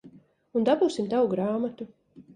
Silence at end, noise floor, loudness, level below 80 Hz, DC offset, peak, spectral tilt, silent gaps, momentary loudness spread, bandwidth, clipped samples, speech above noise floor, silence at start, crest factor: 0.15 s; -53 dBFS; -26 LUFS; -70 dBFS; under 0.1%; -10 dBFS; -6.5 dB/octave; none; 14 LU; 10 kHz; under 0.1%; 28 dB; 0.05 s; 16 dB